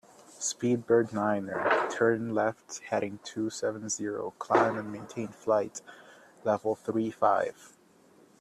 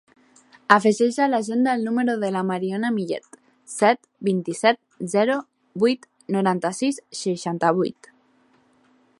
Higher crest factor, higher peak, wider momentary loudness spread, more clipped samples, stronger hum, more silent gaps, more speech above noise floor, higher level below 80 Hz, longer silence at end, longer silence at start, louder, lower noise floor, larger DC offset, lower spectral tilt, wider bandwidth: about the same, 20 dB vs 22 dB; second, -10 dBFS vs 0 dBFS; about the same, 11 LU vs 9 LU; neither; neither; neither; second, 31 dB vs 39 dB; about the same, -72 dBFS vs -72 dBFS; second, 0.75 s vs 1.3 s; second, 0.35 s vs 0.7 s; second, -30 LUFS vs -22 LUFS; about the same, -60 dBFS vs -60 dBFS; neither; about the same, -4.5 dB/octave vs -5 dB/octave; first, 13 kHz vs 11.5 kHz